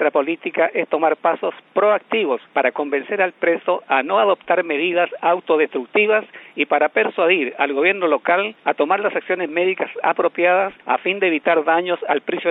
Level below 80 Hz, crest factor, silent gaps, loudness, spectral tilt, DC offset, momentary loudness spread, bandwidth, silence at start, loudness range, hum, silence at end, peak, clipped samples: -78 dBFS; 16 dB; none; -19 LUFS; -8 dB/octave; under 0.1%; 5 LU; 4 kHz; 0 s; 1 LU; none; 0 s; -2 dBFS; under 0.1%